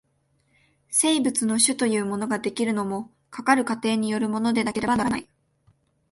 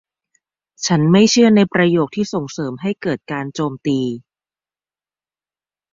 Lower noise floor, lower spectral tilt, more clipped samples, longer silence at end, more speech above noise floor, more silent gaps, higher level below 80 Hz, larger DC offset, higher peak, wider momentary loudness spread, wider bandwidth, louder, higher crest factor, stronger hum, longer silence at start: second, -68 dBFS vs under -90 dBFS; second, -3 dB/octave vs -5.5 dB/octave; neither; second, 0.9 s vs 1.75 s; second, 45 dB vs over 74 dB; neither; about the same, -58 dBFS vs -58 dBFS; neither; second, -6 dBFS vs -2 dBFS; second, 8 LU vs 13 LU; first, 12 kHz vs 7.6 kHz; second, -23 LUFS vs -17 LUFS; about the same, 18 dB vs 16 dB; neither; about the same, 0.9 s vs 0.8 s